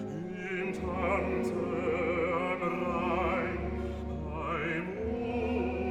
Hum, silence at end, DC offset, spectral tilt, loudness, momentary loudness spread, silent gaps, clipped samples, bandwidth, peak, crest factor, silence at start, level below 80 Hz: none; 0 s; under 0.1%; -7.5 dB/octave; -33 LUFS; 6 LU; none; under 0.1%; 12.5 kHz; -18 dBFS; 14 dB; 0 s; -44 dBFS